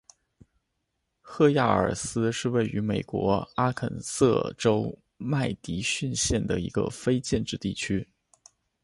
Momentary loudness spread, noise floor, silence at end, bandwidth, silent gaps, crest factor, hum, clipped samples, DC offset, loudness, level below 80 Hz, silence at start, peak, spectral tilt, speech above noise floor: 8 LU; -79 dBFS; 0.8 s; 11.5 kHz; none; 20 dB; none; under 0.1%; under 0.1%; -27 LUFS; -48 dBFS; 1.25 s; -8 dBFS; -5 dB/octave; 53 dB